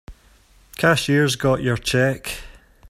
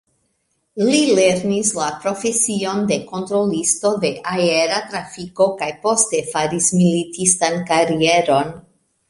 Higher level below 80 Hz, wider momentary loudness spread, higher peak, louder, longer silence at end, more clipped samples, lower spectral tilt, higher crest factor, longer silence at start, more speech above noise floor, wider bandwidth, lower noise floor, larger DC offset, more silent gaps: first, -44 dBFS vs -56 dBFS; first, 14 LU vs 7 LU; about the same, -2 dBFS vs 0 dBFS; about the same, -19 LUFS vs -17 LUFS; second, 0 s vs 0.5 s; neither; first, -5 dB/octave vs -3.5 dB/octave; about the same, 20 dB vs 18 dB; second, 0.1 s vs 0.75 s; second, 34 dB vs 51 dB; first, 16 kHz vs 11.5 kHz; second, -53 dBFS vs -68 dBFS; neither; neither